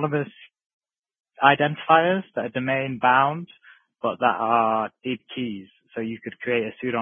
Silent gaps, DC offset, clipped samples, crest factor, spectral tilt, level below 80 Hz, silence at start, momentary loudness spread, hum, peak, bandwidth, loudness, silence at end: 0.66-0.80 s, 0.99-1.03 s, 1.20-1.24 s; under 0.1%; under 0.1%; 24 dB; -8.5 dB/octave; -70 dBFS; 0 s; 14 LU; none; 0 dBFS; 3.7 kHz; -23 LUFS; 0 s